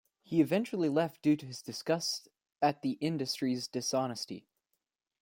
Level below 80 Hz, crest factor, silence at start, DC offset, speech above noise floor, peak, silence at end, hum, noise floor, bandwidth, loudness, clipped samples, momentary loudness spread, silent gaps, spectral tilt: -76 dBFS; 18 dB; 0.3 s; under 0.1%; 52 dB; -14 dBFS; 0.8 s; none; -84 dBFS; 16.5 kHz; -33 LUFS; under 0.1%; 10 LU; none; -5 dB/octave